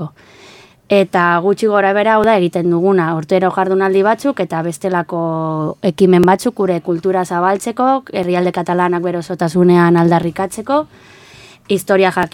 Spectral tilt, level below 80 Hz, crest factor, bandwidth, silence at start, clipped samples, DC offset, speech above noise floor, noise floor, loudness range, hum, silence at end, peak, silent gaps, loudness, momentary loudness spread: -6.5 dB/octave; -52 dBFS; 14 dB; 16.5 kHz; 0 s; under 0.1%; under 0.1%; 28 dB; -42 dBFS; 2 LU; none; 0.05 s; 0 dBFS; none; -14 LUFS; 8 LU